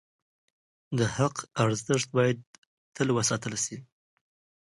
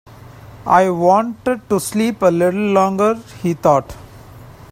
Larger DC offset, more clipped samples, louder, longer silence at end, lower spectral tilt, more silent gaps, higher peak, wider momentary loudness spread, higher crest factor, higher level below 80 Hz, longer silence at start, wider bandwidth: neither; neither; second, -28 LUFS vs -16 LUFS; first, 0.85 s vs 0.2 s; second, -4.5 dB/octave vs -6 dB/octave; first, 2.47-2.92 s vs none; second, -8 dBFS vs 0 dBFS; about the same, 8 LU vs 8 LU; first, 22 dB vs 16 dB; second, -62 dBFS vs -48 dBFS; first, 0.9 s vs 0.35 s; second, 11.5 kHz vs 16 kHz